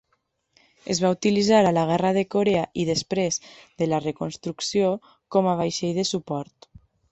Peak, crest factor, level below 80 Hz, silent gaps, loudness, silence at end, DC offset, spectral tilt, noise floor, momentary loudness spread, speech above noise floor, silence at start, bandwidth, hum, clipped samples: -6 dBFS; 18 dB; -60 dBFS; none; -23 LUFS; 0.7 s; under 0.1%; -5 dB/octave; -72 dBFS; 12 LU; 49 dB; 0.85 s; 8.4 kHz; none; under 0.1%